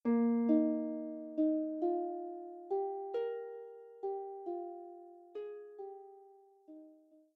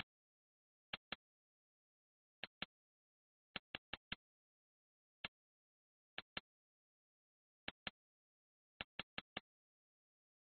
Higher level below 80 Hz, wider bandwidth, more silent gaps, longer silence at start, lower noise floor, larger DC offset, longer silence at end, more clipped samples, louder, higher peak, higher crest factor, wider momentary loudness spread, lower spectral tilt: second, under -90 dBFS vs -78 dBFS; second, 3.7 kHz vs 4.3 kHz; second, none vs 0.03-9.36 s; about the same, 0.05 s vs 0 s; second, -62 dBFS vs under -90 dBFS; neither; second, 0.4 s vs 1.05 s; neither; first, -37 LUFS vs -53 LUFS; first, -20 dBFS vs -30 dBFS; second, 18 dB vs 28 dB; first, 22 LU vs 4 LU; first, -7.5 dB/octave vs -0.5 dB/octave